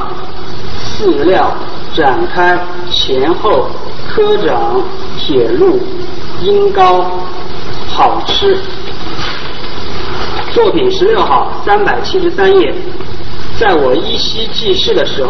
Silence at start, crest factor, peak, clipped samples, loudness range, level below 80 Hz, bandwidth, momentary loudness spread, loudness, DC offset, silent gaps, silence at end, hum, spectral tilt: 0 s; 14 dB; 0 dBFS; 0.2%; 2 LU; -32 dBFS; 6.4 kHz; 13 LU; -12 LUFS; 30%; none; 0 s; none; -5 dB/octave